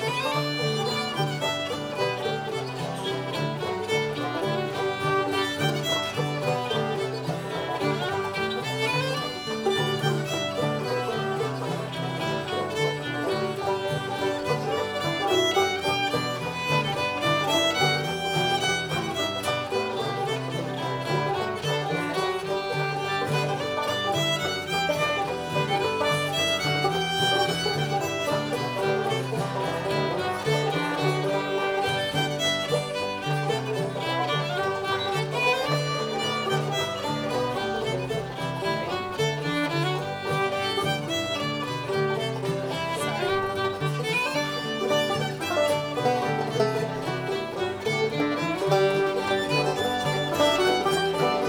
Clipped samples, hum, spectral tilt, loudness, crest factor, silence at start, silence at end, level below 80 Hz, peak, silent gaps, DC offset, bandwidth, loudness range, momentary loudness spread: under 0.1%; none; -4.5 dB/octave; -26 LUFS; 18 dB; 0 s; 0 s; -60 dBFS; -8 dBFS; none; under 0.1%; over 20 kHz; 3 LU; 5 LU